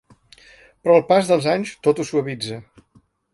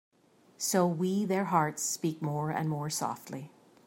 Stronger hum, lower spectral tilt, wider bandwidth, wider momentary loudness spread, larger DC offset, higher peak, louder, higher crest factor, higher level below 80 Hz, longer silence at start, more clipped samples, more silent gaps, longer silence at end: neither; about the same, -5.5 dB/octave vs -5 dB/octave; second, 11.5 kHz vs 16.5 kHz; about the same, 14 LU vs 13 LU; neither; first, -2 dBFS vs -12 dBFS; first, -19 LUFS vs -31 LUFS; about the same, 20 dB vs 20 dB; first, -62 dBFS vs -74 dBFS; first, 0.85 s vs 0.6 s; neither; neither; first, 0.75 s vs 0.4 s